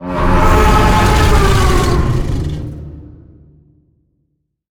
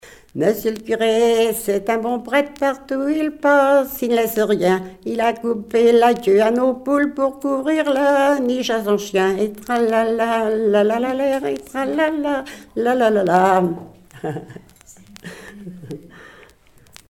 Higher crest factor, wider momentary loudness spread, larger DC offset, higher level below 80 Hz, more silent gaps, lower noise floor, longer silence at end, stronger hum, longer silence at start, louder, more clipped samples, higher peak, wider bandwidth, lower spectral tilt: second, 12 dB vs 18 dB; about the same, 15 LU vs 15 LU; neither; first, -16 dBFS vs -54 dBFS; neither; first, -66 dBFS vs -50 dBFS; first, 1.65 s vs 0.85 s; neither; about the same, 0 s vs 0.05 s; first, -13 LUFS vs -18 LUFS; neither; about the same, 0 dBFS vs -2 dBFS; about the same, 19 kHz vs 17.5 kHz; about the same, -5.5 dB/octave vs -5 dB/octave